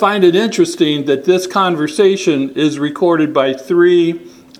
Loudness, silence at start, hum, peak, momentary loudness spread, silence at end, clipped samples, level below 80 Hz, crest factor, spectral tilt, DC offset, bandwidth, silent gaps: -13 LUFS; 0 s; none; 0 dBFS; 5 LU; 0.3 s; under 0.1%; -62 dBFS; 14 dB; -5 dB/octave; under 0.1%; 13.5 kHz; none